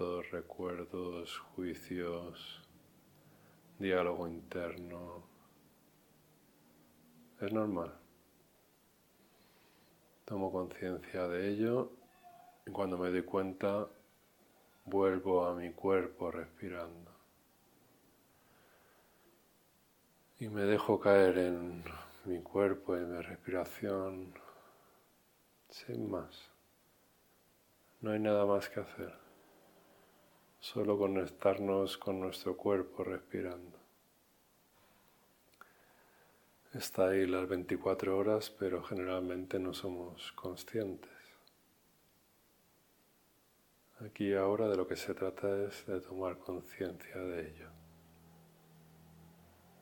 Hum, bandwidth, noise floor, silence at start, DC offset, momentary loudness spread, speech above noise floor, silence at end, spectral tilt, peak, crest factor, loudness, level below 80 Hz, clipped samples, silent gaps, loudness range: none; 17.5 kHz; -71 dBFS; 0 s; under 0.1%; 17 LU; 34 dB; 0.55 s; -6 dB/octave; -12 dBFS; 26 dB; -37 LUFS; -72 dBFS; under 0.1%; none; 13 LU